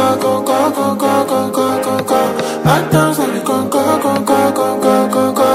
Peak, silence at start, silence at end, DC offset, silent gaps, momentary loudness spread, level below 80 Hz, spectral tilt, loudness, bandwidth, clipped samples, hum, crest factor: 0 dBFS; 0 s; 0 s; under 0.1%; none; 3 LU; -48 dBFS; -5 dB/octave; -14 LUFS; 16 kHz; under 0.1%; none; 12 dB